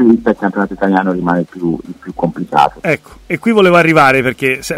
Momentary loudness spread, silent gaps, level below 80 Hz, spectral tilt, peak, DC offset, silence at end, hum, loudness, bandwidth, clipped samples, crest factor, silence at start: 11 LU; none; -44 dBFS; -6 dB/octave; 0 dBFS; under 0.1%; 0 s; none; -13 LUFS; 16 kHz; under 0.1%; 12 dB; 0 s